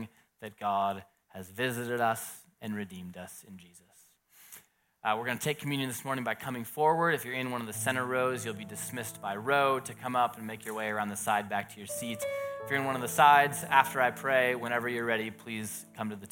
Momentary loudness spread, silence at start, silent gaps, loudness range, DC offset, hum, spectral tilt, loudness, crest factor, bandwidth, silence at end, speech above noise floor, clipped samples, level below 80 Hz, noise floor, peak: 17 LU; 0 s; none; 10 LU; under 0.1%; none; -4 dB/octave; -30 LUFS; 24 dB; 17 kHz; 0.05 s; 32 dB; under 0.1%; -76 dBFS; -63 dBFS; -8 dBFS